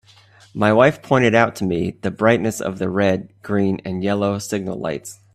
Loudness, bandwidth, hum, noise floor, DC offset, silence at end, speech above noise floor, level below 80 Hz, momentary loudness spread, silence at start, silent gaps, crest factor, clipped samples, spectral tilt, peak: -19 LUFS; 14.5 kHz; none; -50 dBFS; under 0.1%; 0.2 s; 31 dB; -54 dBFS; 11 LU; 0.55 s; none; 18 dB; under 0.1%; -6 dB/octave; 0 dBFS